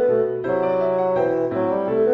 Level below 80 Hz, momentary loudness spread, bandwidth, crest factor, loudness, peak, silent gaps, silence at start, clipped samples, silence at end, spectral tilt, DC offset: -58 dBFS; 2 LU; 5.6 kHz; 12 dB; -21 LUFS; -8 dBFS; none; 0 s; under 0.1%; 0 s; -9.5 dB/octave; under 0.1%